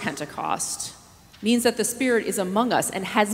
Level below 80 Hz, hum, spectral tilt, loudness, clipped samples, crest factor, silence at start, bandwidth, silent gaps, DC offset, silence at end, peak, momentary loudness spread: -60 dBFS; none; -3 dB/octave; -24 LUFS; under 0.1%; 22 dB; 0 s; 16 kHz; none; under 0.1%; 0 s; -4 dBFS; 9 LU